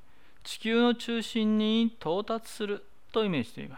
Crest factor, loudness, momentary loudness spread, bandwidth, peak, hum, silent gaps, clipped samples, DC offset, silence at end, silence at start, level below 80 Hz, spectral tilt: 14 dB; -29 LUFS; 10 LU; 15.5 kHz; -16 dBFS; none; none; under 0.1%; 0.5%; 0 s; 0.45 s; -66 dBFS; -5.5 dB/octave